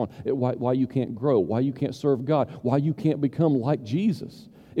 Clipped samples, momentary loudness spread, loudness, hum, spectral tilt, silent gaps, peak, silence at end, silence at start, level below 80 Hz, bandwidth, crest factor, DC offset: under 0.1%; 4 LU; -25 LUFS; none; -9 dB/octave; none; -8 dBFS; 0 s; 0 s; -62 dBFS; 10.5 kHz; 16 dB; under 0.1%